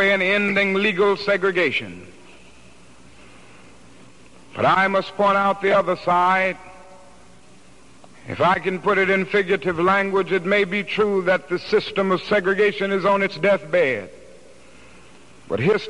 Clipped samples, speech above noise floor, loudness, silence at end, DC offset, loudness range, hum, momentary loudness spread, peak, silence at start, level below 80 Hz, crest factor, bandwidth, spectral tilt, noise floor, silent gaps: under 0.1%; 30 dB; -19 LUFS; 0 s; 0.5%; 5 LU; none; 5 LU; -6 dBFS; 0 s; -58 dBFS; 16 dB; 11 kHz; -6 dB/octave; -50 dBFS; none